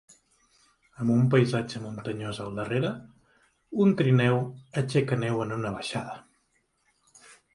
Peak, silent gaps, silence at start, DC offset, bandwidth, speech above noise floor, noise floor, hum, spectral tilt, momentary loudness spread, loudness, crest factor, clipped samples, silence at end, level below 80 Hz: -8 dBFS; none; 1 s; under 0.1%; 11.5 kHz; 45 dB; -71 dBFS; none; -7 dB/octave; 13 LU; -27 LUFS; 20 dB; under 0.1%; 0.2 s; -62 dBFS